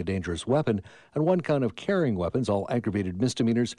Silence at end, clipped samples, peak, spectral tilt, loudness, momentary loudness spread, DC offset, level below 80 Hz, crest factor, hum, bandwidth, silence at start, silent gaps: 0.05 s; under 0.1%; -12 dBFS; -6.5 dB/octave; -27 LUFS; 5 LU; under 0.1%; -54 dBFS; 14 dB; none; 11.5 kHz; 0 s; none